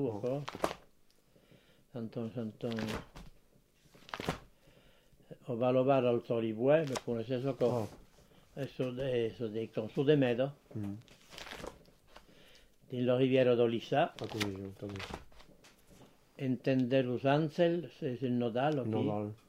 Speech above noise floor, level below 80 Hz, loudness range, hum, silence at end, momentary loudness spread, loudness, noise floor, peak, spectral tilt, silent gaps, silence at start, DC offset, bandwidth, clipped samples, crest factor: 33 dB; -64 dBFS; 10 LU; none; 0.15 s; 17 LU; -34 LUFS; -66 dBFS; -12 dBFS; -7 dB/octave; none; 0 s; under 0.1%; 16 kHz; under 0.1%; 22 dB